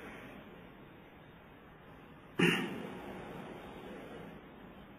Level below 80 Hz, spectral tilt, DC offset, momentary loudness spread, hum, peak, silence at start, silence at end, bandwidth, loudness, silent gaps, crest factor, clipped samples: -66 dBFS; -5 dB/octave; under 0.1%; 25 LU; none; -16 dBFS; 0 s; 0 s; 15.5 kHz; -38 LUFS; none; 26 dB; under 0.1%